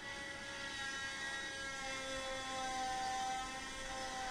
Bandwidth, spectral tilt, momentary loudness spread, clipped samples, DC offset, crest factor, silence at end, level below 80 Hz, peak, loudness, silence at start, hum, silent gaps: 16 kHz; -1.5 dB/octave; 5 LU; under 0.1%; under 0.1%; 14 dB; 0 s; -60 dBFS; -28 dBFS; -42 LUFS; 0 s; none; none